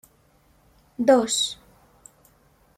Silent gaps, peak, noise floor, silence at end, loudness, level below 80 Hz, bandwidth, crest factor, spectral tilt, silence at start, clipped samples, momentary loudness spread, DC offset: none; -6 dBFS; -60 dBFS; 1.25 s; -21 LUFS; -62 dBFS; 16 kHz; 22 dB; -2 dB/octave; 1 s; under 0.1%; 23 LU; under 0.1%